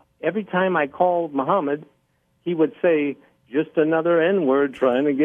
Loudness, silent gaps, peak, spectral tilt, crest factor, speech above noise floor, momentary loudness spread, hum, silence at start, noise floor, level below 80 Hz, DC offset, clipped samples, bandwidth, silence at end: -21 LUFS; none; -6 dBFS; -8.5 dB/octave; 16 dB; 46 dB; 9 LU; none; 0.25 s; -66 dBFS; -70 dBFS; under 0.1%; under 0.1%; 3.7 kHz; 0 s